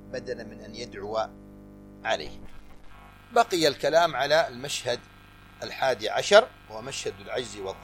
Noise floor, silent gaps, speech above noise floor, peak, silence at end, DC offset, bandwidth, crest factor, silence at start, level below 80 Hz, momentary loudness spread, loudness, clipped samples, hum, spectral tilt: -47 dBFS; none; 21 dB; -4 dBFS; 0 s; under 0.1%; 16.5 kHz; 24 dB; 0 s; -54 dBFS; 18 LU; -26 LUFS; under 0.1%; 50 Hz at -55 dBFS; -3 dB/octave